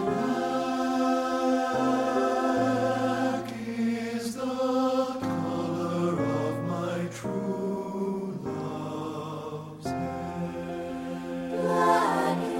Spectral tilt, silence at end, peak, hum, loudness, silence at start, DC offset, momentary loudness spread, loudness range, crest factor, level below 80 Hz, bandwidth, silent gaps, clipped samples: -6 dB/octave; 0 s; -12 dBFS; none; -29 LUFS; 0 s; under 0.1%; 9 LU; 7 LU; 16 dB; -62 dBFS; 16 kHz; none; under 0.1%